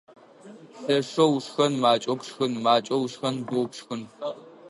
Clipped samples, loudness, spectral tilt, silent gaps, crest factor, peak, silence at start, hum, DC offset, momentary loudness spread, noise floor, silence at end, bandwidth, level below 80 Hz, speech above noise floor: under 0.1%; -25 LUFS; -5 dB/octave; none; 20 dB; -6 dBFS; 0.45 s; none; under 0.1%; 13 LU; -48 dBFS; 0 s; 11.5 kHz; -76 dBFS; 23 dB